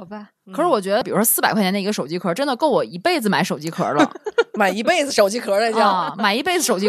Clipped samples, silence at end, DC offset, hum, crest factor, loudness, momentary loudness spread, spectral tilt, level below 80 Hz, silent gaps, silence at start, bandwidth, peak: under 0.1%; 0 s; under 0.1%; none; 18 dB; -19 LUFS; 7 LU; -3.5 dB/octave; -68 dBFS; none; 0 s; 14 kHz; -2 dBFS